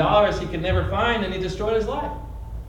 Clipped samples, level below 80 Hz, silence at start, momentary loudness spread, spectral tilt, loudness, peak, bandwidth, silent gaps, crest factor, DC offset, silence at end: under 0.1%; -34 dBFS; 0 s; 12 LU; -6.5 dB/octave; -23 LUFS; -4 dBFS; 16.5 kHz; none; 18 dB; under 0.1%; 0 s